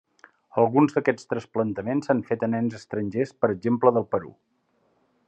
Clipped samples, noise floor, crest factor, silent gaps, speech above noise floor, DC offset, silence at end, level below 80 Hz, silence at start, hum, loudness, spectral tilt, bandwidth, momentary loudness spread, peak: under 0.1%; -68 dBFS; 20 dB; none; 44 dB; under 0.1%; 1 s; -74 dBFS; 0.55 s; none; -25 LUFS; -8 dB/octave; 8.6 kHz; 9 LU; -4 dBFS